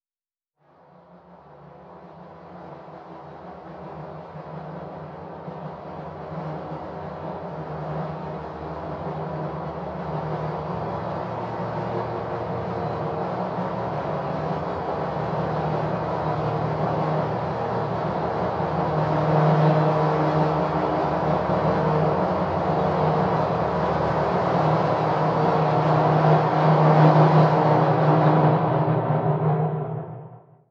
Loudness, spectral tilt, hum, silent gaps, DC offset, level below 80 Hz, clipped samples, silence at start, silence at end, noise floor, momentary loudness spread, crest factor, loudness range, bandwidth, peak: -23 LUFS; -9 dB/octave; none; none; under 0.1%; -50 dBFS; under 0.1%; 1.15 s; 0.3 s; under -90 dBFS; 18 LU; 20 dB; 19 LU; 6.2 kHz; -4 dBFS